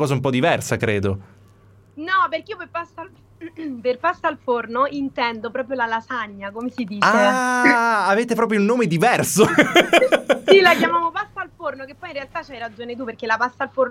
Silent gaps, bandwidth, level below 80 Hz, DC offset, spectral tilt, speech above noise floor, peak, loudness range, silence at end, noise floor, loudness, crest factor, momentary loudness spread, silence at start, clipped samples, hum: none; 16.5 kHz; -58 dBFS; under 0.1%; -4.5 dB/octave; 31 dB; 0 dBFS; 9 LU; 0 s; -51 dBFS; -19 LUFS; 20 dB; 17 LU; 0 s; under 0.1%; none